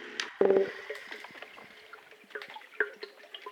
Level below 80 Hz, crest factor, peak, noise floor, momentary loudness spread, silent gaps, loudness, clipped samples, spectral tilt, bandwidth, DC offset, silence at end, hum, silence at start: -82 dBFS; 24 dB; -12 dBFS; -53 dBFS; 23 LU; none; -32 LUFS; under 0.1%; -4 dB/octave; 12.5 kHz; under 0.1%; 0 s; none; 0 s